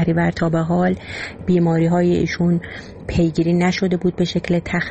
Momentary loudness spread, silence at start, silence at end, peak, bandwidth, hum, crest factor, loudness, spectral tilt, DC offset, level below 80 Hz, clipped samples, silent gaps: 9 LU; 0 s; 0 s; -6 dBFS; 8.4 kHz; none; 12 dB; -19 LUFS; -7.5 dB/octave; 0.2%; -40 dBFS; under 0.1%; none